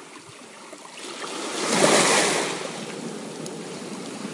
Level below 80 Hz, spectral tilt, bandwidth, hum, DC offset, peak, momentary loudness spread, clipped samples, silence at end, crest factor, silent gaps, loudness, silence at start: -74 dBFS; -2 dB/octave; 11.5 kHz; none; under 0.1%; -4 dBFS; 24 LU; under 0.1%; 0 s; 22 dB; none; -23 LUFS; 0 s